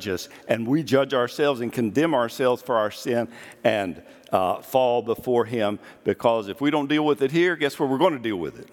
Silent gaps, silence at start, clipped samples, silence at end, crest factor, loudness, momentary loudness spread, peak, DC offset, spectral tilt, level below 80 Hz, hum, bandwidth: none; 0 s; under 0.1%; 0.1 s; 20 dB; -23 LUFS; 7 LU; -4 dBFS; under 0.1%; -5.5 dB/octave; -66 dBFS; none; 18 kHz